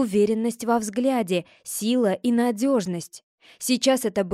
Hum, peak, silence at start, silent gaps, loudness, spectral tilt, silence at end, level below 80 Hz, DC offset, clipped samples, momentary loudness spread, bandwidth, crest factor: none; -8 dBFS; 0 s; 3.23-3.38 s; -23 LUFS; -4.5 dB/octave; 0 s; -66 dBFS; under 0.1%; under 0.1%; 10 LU; 15.5 kHz; 16 dB